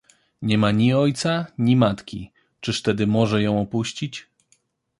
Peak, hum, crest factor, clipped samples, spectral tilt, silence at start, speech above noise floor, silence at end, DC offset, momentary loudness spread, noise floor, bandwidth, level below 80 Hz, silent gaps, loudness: -4 dBFS; none; 18 dB; under 0.1%; -6 dB/octave; 0.4 s; 44 dB; 0.8 s; under 0.1%; 14 LU; -65 dBFS; 11.5 kHz; -52 dBFS; none; -21 LUFS